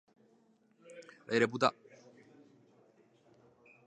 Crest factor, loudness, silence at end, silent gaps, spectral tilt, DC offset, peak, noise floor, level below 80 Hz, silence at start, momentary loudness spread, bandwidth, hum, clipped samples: 28 dB; -32 LUFS; 2.15 s; none; -5 dB/octave; under 0.1%; -12 dBFS; -69 dBFS; -82 dBFS; 0.9 s; 24 LU; 9.6 kHz; none; under 0.1%